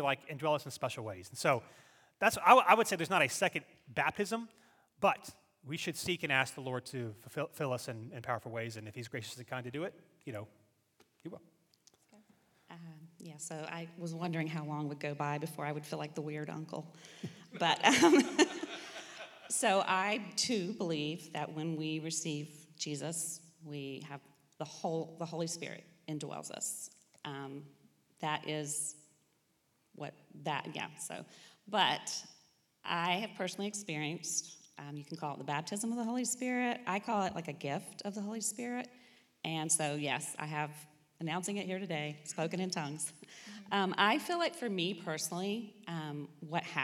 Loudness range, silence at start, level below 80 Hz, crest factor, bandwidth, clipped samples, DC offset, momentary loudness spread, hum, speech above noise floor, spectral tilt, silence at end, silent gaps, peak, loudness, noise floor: 12 LU; 0 s; -80 dBFS; 28 dB; 19 kHz; under 0.1%; under 0.1%; 17 LU; none; 40 dB; -3.5 dB/octave; 0 s; none; -8 dBFS; -35 LUFS; -76 dBFS